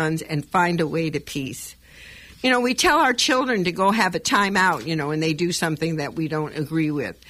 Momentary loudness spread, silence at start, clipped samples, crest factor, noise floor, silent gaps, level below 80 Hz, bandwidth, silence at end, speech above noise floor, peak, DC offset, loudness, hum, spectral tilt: 10 LU; 0 s; under 0.1%; 16 dB; -44 dBFS; none; -52 dBFS; 15.5 kHz; 0.15 s; 23 dB; -6 dBFS; under 0.1%; -21 LUFS; none; -4 dB/octave